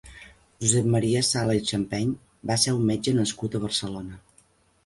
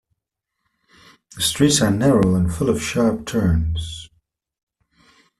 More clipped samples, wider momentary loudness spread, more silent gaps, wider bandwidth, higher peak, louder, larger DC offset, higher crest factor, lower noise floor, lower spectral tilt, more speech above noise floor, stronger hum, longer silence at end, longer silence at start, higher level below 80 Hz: neither; about the same, 9 LU vs 10 LU; neither; second, 11.5 kHz vs 14 kHz; second, -6 dBFS vs -2 dBFS; second, -25 LUFS vs -19 LUFS; neither; about the same, 20 dB vs 18 dB; second, -61 dBFS vs -80 dBFS; about the same, -4.5 dB/octave vs -5 dB/octave; second, 37 dB vs 62 dB; neither; second, 0.65 s vs 1.35 s; second, 0.05 s vs 1.35 s; second, -54 dBFS vs -38 dBFS